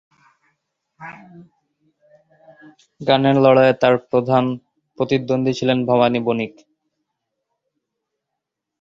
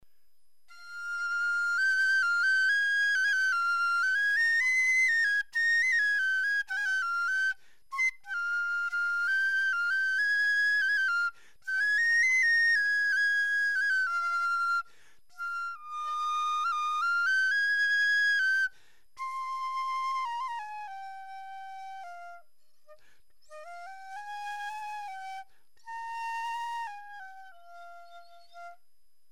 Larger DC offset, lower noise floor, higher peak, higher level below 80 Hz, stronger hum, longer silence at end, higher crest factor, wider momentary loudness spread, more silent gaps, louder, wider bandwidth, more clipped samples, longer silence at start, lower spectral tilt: second, under 0.1% vs 0.3%; first, -81 dBFS vs -76 dBFS; first, -2 dBFS vs -20 dBFS; first, -60 dBFS vs -78 dBFS; neither; first, 2.35 s vs 0.55 s; first, 20 dB vs 10 dB; about the same, 19 LU vs 19 LU; neither; first, -17 LUFS vs -27 LUFS; second, 7.4 kHz vs 16 kHz; neither; first, 1 s vs 0 s; first, -7 dB/octave vs 3.5 dB/octave